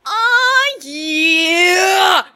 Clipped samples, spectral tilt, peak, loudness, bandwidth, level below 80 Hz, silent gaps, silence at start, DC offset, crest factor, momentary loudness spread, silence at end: under 0.1%; 0.5 dB/octave; 0 dBFS; -12 LUFS; 17 kHz; -66 dBFS; none; 0.05 s; under 0.1%; 14 dB; 8 LU; 0.1 s